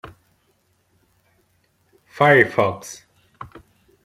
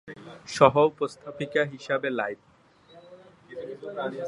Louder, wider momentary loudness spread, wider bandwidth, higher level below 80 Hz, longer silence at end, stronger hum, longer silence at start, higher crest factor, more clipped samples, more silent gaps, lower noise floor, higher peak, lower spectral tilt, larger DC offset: first, -16 LUFS vs -26 LUFS; first, 27 LU vs 23 LU; first, 16 kHz vs 11.5 kHz; about the same, -60 dBFS vs -64 dBFS; first, 0.6 s vs 0 s; neither; first, 2.15 s vs 0.05 s; about the same, 22 dB vs 26 dB; neither; neither; first, -65 dBFS vs -54 dBFS; about the same, -2 dBFS vs -2 dBFS; about the same, -5.5 dB/octave vs -5.5 dB/octave; neither